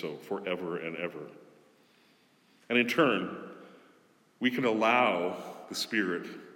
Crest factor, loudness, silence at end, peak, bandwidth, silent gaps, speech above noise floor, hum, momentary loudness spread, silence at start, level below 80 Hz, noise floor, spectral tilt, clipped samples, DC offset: 20 dB; -30 LUFS; 0 s; -12 dBFS; 18 kHz; none; 35 dB; none; 18 LU; 0 s; -88 dBFS; -65 dBFS; -4.5 dB/octave; under 0.1%; under 0.1%